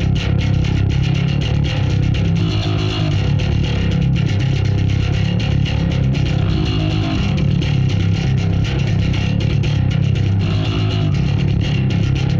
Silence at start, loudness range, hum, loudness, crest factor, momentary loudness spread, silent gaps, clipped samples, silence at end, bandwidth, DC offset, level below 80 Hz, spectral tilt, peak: 0 s; 0 LU; none; -17 LUFS; 10 dB; 1 LU; none; under 0.1%; 0 s; 7.4 kHz; under 0.1%; -26 dBFS; -7 dB/octave; -6 dBFS